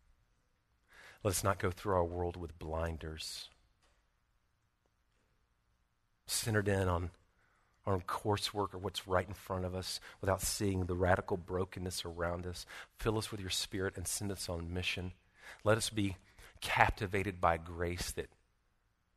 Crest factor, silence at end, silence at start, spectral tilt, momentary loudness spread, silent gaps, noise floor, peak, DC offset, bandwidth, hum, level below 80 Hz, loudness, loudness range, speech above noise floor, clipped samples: 30 dB; 0.9 s; 0.95 s; -4 dB/octave; 12 LU; none; -78 dBFS; -8 dBFS; under 0.1%; 13.5 kHz; none; -54 dBFS; -37 LUFS; 7 LU; 41 dB; under 0.1%